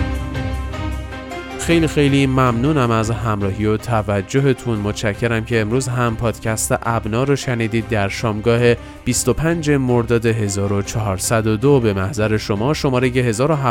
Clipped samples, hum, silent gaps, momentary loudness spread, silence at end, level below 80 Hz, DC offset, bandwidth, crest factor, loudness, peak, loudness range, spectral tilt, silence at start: under 0.1%; none; none; 8 LU; 0 s; -34 dBFS; under 0.1%; 17 kHz; 16 dB; -18 LUFS; -2 dBFS; 2 LU; -5.5 dB/octave; 0 s